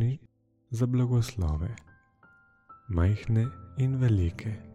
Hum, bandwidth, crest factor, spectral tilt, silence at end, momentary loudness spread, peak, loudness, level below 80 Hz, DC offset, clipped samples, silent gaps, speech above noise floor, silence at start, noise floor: none; 12.5 kHz; 14 dB; -8 dB/octave; 0.05 s; 12 LU; -16 dBFS; -29 LUFS; -44 dBFS; under 0.1%; under 0.1%; none; 35 dB; 0 s; -62 dBFS